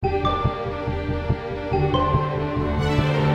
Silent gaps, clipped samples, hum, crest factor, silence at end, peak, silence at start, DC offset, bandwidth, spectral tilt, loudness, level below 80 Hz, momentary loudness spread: none; under 0.1%; none; 16 dB; 0 s; -6 dBFS; 0 s; under 0.1%; 8.6 kHz; -7.5 dB/octave; -23 LUFS; -32 dBFS; 6 LU